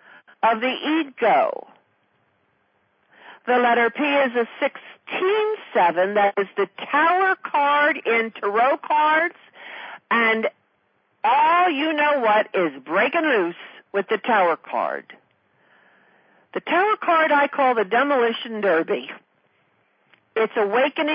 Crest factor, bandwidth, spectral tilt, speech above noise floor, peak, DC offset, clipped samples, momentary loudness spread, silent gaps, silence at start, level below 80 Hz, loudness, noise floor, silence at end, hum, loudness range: 14 dB; 5.2 kHz; -8.5 dB/octave; 46 dB; -8 dBFS; under 0.1%; under 0.1%; 10 LU; none; 0.45 s; -78 dBFS; -20 LUFS; -66 dBFS; 0 s; none; 4 LU